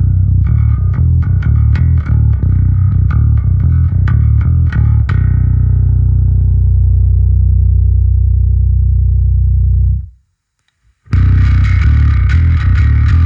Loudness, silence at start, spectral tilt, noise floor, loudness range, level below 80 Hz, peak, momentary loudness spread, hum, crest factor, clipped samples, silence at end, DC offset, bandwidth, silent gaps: -11 LUFS; 0 s; -9.5 dB/octave; -64 dBFS; 2 LU; -12 dBFS; 0 dBFS; 2 LU; none; 8 dB; under 0.1%; 0 s; under 0.1%; 4.2 kHz; none